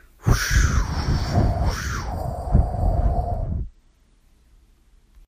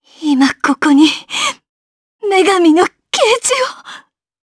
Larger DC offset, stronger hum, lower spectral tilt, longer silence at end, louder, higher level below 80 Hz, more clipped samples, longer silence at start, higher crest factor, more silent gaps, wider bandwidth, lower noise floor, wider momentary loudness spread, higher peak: neither; neither; first, -5.5 dB/octave vs -1.5 dB/octave; first, 1.6 s vs 0.45 s; second, -23 LUFS vs -12 LUFS; first, -26 dBFS vs -60 dBFS; neither; about the same, 0.25 s vs 0.2 s; about the same, 18 dB vs 14 dB; second, none vs 1.69-2.19 s; first, 15.5 kHz vs 11 kHz; first, -57 dBFS vs -39 dBFS; about the same, 9 LU vs 10 LU; second, -4 dBFS vs 0 dBFS